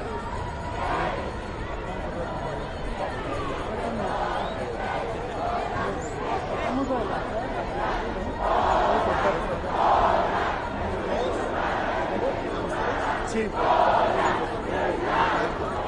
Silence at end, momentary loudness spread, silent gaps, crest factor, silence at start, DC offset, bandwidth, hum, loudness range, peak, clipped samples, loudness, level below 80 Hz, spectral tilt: 0 s; 10 LU; none; 18 dB; 0 s; under 0.1%; 11 kHz; none; 6 LU; -8 dBFS; under 0.1%; -26 LUFS; -38 dBFS; -5.5 dB/octave